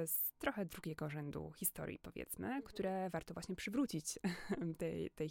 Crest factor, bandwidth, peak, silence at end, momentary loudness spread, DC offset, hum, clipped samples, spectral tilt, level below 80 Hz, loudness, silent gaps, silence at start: 20 dB; 17 kHz; -22 dBFS; 0 s; 8 LU; under 0.1%; none; under 0.1%; -5 dB/octave; -66 dBFS; -43 LUFS; none; 0 s